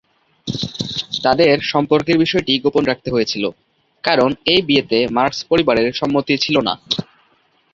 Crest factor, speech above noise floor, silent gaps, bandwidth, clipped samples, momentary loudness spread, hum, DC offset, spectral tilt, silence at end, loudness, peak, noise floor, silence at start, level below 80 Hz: 16 dB; 42 dB; none; 7.6 kHz; under 0.1%; 9 LU; none; under 0.1%; -5 dB/octave; 0.7 s; -17 LUFS; -2 dBFS; -58 dBFS; 0.45 s; -50 dBFS